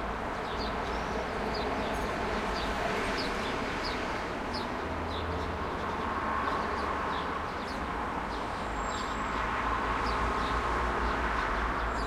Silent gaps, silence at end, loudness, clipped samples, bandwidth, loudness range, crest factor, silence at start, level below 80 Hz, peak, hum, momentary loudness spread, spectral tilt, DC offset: none; 0 s; -32 LUFS; under 0.1%; 15.5 kHz; 2 LU; 14 dB; 0 s; -42 dBFS; -18 dBFS; none; 4 LU; -5 dB/octave; under 0.1%